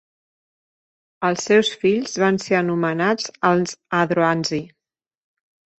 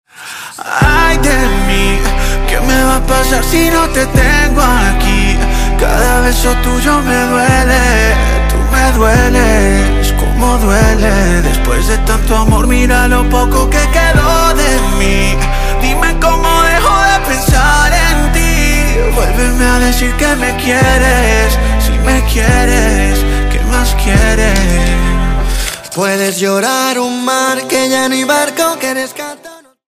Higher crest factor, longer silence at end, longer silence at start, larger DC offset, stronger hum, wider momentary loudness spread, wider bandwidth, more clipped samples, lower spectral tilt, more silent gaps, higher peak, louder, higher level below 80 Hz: first, 18 dB vs 10 dB; first, 1.1 s vs 0.35 s; first, 1.2 s vs 0.2 s; neither; neither; about the same, 6 LU vs 5 LU; second, 8.4 kHz vs 16 kHz; neither; about the same, -5 dB/octave vs -4.5 dB/octave; neither; about the same, -2 dBFS vs 0 dBFS; second, -20 LUFS vs -11 LUFS; second, -64 dBFS vs -12 dBFS